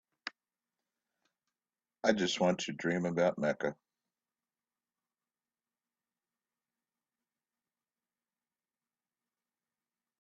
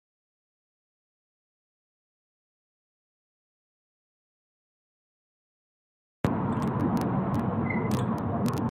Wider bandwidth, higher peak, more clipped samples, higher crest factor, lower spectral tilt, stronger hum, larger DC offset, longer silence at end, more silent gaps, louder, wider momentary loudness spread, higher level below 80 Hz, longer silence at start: second, 8 kHz vs 16.5 kHz; about the same, -10 dBFS vs -10 dBFS; neither; first, 30 dB vs 22 dB; second, -5 dB/octave vs -8 dB/octave; neither; neither; first, 6.5 s vs 0 s; neither; second, -33 LUFS vs -28 LUFS; first, 15 LU vs 2 LU; second, -76 dBFS vs -56 dBFS; second, 0.25 s vs 6.25 s